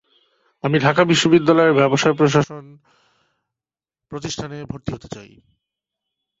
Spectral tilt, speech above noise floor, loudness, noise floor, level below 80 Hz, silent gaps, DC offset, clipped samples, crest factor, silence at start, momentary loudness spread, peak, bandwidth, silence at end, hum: -5.5 dB/octave; over 72 dB; -17 LUFS; under -90 dBFS; -52 dBFS; none; under 0.1%; under 0.1%; 18 dB; 0.65 s; 20 LU; -2 dBFS; 8 kHz; 1.15 s; none